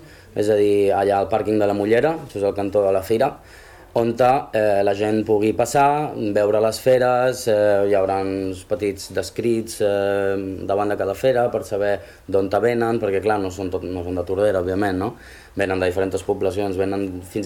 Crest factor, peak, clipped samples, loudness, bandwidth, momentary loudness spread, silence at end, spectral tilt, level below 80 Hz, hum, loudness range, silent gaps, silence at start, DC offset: 14 dB; -6 dBFS; under 0.1%; -20 LUFS; 17.5 kHz; 9 LU; 0 s; -6 dB/octave; -50 dBFS; none; 4 LU; none; 0 s; under 0.1%